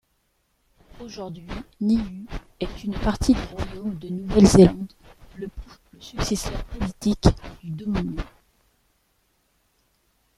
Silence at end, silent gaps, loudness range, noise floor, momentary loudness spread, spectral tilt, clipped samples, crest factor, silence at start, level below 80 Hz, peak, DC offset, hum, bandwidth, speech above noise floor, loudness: 2.1 s; none; 7 LU; -69 dBFS; 21 LU; -6.5 dB/octave; under 0.1%; 22 dB; 1 s; -36 dBFS; -2 dBFS; under 0.1%; none; 13.5 kHz; 47 dB; -22 LUFS